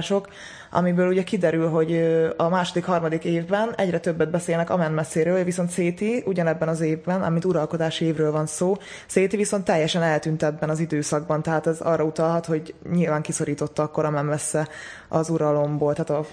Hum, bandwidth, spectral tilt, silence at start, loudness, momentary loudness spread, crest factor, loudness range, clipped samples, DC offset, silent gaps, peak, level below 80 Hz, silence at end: none; 10.5 kHz; -6 dB/octave; 0 s; -23 LUFS; 5 LU; 18 dB; 2 LU; under 0.1%; under 0.1%; none; -6 dBFS; -60 dBFS; 0 s